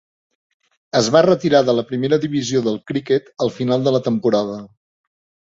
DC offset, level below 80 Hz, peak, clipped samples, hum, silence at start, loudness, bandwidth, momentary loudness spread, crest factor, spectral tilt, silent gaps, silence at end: under 0.1%; -58 dBFS; -2 dBFS; under 0.1%; none; 0.95 s; -18 LUFS; 7.8 kHz; 8 LU; 16 dB; -5.5 dB/octave; none; 0.85 s